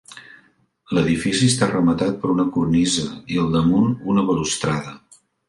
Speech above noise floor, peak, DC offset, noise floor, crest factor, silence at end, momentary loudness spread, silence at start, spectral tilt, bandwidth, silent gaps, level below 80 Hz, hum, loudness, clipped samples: 39 dB; -2 dBFS; under 0.1%; -58 dBFS; 18 dB; 0.5 s; 7 LU; 0.1 s; -5 dB/octave; 11.5 kHz; none; -46 dBFS; none; -20 LUFS; under 0.1%